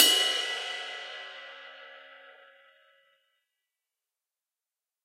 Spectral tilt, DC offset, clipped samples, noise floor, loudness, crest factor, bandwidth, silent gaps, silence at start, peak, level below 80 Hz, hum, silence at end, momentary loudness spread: 3.5 dB/octave; under 0.1%; under 0.1%; under -90 dBFS; -28 LUFS; 32 dB; 16 kHz; none; 0 s; -2 dBFS; under -90 dBFS; none; 2.75 s; 25 LU